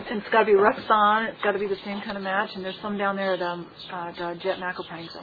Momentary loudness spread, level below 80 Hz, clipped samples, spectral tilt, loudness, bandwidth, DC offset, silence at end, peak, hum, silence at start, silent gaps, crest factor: 15 LU; -62 dBFS; under 0.1%; -7.5 dB/octave; -25 LUFS; 4.9 kHz; under 0.1%; 0 s; -4 dBFS; none; 0 s; none; 20 dB